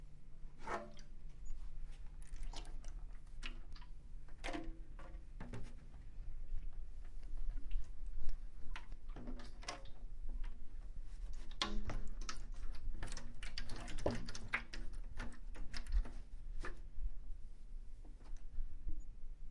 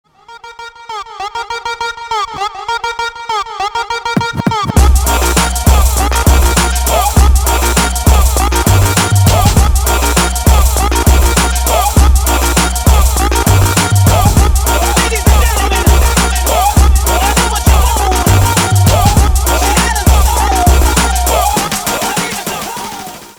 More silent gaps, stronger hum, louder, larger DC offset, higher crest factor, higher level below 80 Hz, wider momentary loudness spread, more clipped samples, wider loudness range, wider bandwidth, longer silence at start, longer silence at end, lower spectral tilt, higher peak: neither; neither; second, -51 LUFS vs -11 LUFS; neither; first, 20 dB vs 10 dB; second, -44 dBFS vs -14 dBFS; first, 15 LU vs 9 LU; neither; about the same, 7 LU vs 5 LU; second, 10.5 kHz vs over 20 kHz; second, 0 s vs 0.3 s; about the same, 0 s vs 0.05 s; about the same, -4.5 dB/octave vs -4 dB/octave; second, -20 dBFS vs 0 dBFS